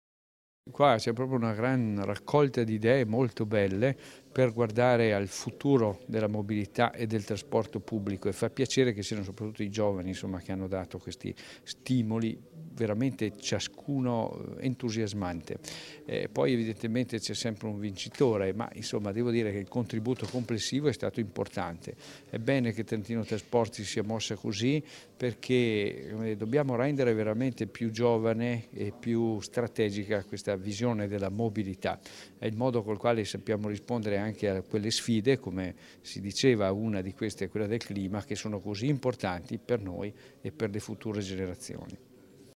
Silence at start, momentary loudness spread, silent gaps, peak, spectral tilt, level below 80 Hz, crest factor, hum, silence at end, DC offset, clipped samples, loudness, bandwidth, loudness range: 0.65 s; 11 LU; none; -8 dBFS; -6 dB/octave; -64 dBFS; 22 dB; none; 0.15 s; under 0.1%; under 0.1%; -31 LUFS; 15.5 kHz; 5 LU